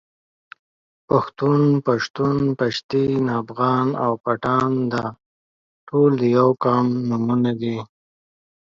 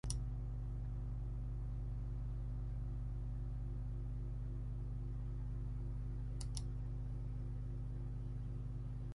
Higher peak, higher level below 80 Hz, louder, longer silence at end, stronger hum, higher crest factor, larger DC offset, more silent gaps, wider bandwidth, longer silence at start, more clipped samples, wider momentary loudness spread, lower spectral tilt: first, -2 dBFS vs -24 dBFS; second, -58 dBFS vs -44 dBFS; first, -20 LUFS vs -45 LUFS; first, 0.8 s vs 0 s; second, none vs 50 Hz at -45 dBFS; about the same, 18 dB vs 18 dB; neither; first, 2.10-2.14 s, 2.84-2.89 s, 5.26-5.87 s vs none; second, 7.4 kHz vs 11 kHz; first, 1.1 s vs 0.05 s; neither; first, 7 LU vs 1 LU; first, -8 dB/octave vs -6.5 dB/octave